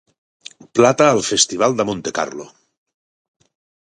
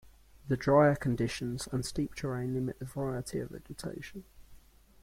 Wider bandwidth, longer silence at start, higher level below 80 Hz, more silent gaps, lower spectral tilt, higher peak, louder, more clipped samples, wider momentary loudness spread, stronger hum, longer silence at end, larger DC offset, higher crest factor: second, 11.5 kHz vs 16.5 kHz; first, 0.75 s vs 0.05 s; about the same, -58 dBFS vs -54 dBFS; neither; second, -3 dB/octave vs -6.5 dB/octave; first, 0 dBFS vs -12 dBFS; first, -16 LUFS vs -32 LUFS; neither; second, 12 LU vs 18 LU; neither; first, 1.4 s vs 0.45 s; neither; about the same, 20 dB vs 20 dB